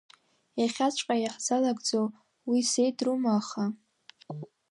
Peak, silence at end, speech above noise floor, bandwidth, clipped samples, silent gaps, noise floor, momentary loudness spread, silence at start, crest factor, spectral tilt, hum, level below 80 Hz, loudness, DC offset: -14 dBFS; 0.25 s; 21 dB; 11.5 kHz; under 0.1%; none; -48 dBFS; 16 LU; 0.55 s; 14 dB; -4 dB/octave; none; -82 dBFS; -29 LUFS; under 0.1%